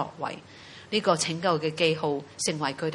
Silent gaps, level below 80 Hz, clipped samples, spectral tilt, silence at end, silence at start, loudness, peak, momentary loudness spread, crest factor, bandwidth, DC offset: none; -68 dBFS; under 0.1%; -3.5 dB/octave; 0 s; 0 s; -27 LUFS; -8 dBFS; 14 LU; 22 dB; 11.5 kHz; under 0.1%